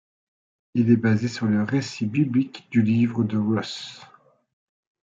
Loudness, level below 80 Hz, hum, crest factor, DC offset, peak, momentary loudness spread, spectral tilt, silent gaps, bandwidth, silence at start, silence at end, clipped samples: -23 LUFS; -66 dBFS; none; 18 dB; under 0.1%; -6 dBFS; 9 LU; -7 dB/octave; none; 7.6 kHz; 0.75 s; 1 s; under 0.1%